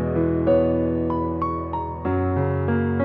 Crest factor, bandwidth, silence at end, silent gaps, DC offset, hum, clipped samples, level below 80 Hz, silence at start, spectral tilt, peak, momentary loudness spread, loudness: 14 dB; 4.7 kHz; 0 s; none; under 0.1%; none; under 0.1%; -44 dBFS; 0 s; -12 dB/octave; -8 dBFS; 7 LU; -23 LUFS